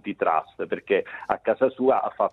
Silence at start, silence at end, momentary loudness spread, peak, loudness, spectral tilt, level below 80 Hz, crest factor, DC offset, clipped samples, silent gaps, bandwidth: 0.05 s; 0 s; 8 LU; -4 dBFS; -25 LUFS; -7.5 dB/octave; -64 dBFS; 20 dB; under 0.1%; under 0.1%; none; 4.1 kHz